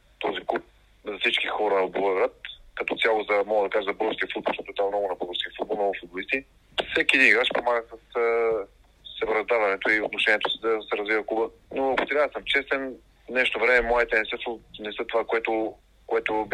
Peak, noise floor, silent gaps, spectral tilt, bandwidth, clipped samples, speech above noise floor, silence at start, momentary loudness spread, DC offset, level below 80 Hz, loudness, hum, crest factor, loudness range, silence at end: -4 dBFS; -47 dBFS; none; -3.5 dB/octave; 11.5 kHz; under 0.1%; 22 dB; 0.2 s; 11 LU; under 0.1%; -54 dBFS; -25 LUFS; none; 22 dB; 3 LU; 0 s